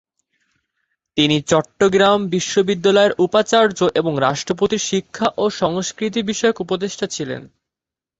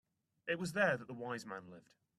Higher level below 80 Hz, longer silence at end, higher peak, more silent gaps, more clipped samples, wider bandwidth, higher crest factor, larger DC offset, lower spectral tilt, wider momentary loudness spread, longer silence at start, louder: first, -56 dBFS vs -80 dBFS; first, 0.75 s vs 0.4 s; first, -2 dBFS vs -18 dBFS; neither; neither; second, 8.2 kHz vs 13 kHz; second, 16 dB vs 22 dB; neither; about the same, -4 dB/octave vs -5 dB/octave; second, 9 LU vs 16 LU; first, 1.15 s vs 0.45 s; first, -18 LUFS vs -38 LUFS